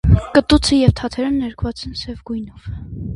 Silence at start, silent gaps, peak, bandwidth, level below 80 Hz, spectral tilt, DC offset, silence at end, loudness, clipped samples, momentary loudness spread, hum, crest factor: 0.05 s; none; 0 dBFS; 11.5 kHz; -26 dBFS; -6 dB/octave; under 0.1%; 0 s; -17 LUFS; under 0.1%; 16 LU; none; 18 dB